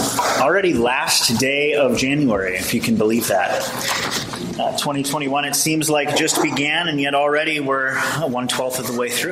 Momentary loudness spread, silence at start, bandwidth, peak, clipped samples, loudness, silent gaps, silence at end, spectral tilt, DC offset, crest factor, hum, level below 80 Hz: 5 LU; 0 s; 16 kHz; -4 dBFS; under 0.1%; -18 LUFS; none; 0 s; -3 dB/octave; under 0.1%; 16 dB; none; -52 dBFS